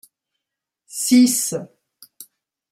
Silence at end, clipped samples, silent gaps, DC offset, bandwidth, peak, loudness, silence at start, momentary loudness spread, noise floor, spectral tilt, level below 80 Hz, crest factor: 0.5 s; under 0.1%; none; under 0.1%; 16 kHz; -4 dBFS; -17 LUFS; 0.9 s; 17 LU; -84 dBFS; -3 dB/octave; -72 dBFS; 18 dB